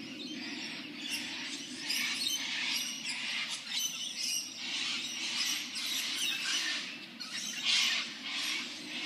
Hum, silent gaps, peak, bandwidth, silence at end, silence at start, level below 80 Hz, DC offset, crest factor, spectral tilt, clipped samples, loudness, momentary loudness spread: none; none; -14 dBFS; 15.5 kHz; 0 s; 0 s; -86 dBFS; under 0.1%; 22 dB; 1 dB/octave; under 0.1%; -33 LUFS; 9 LU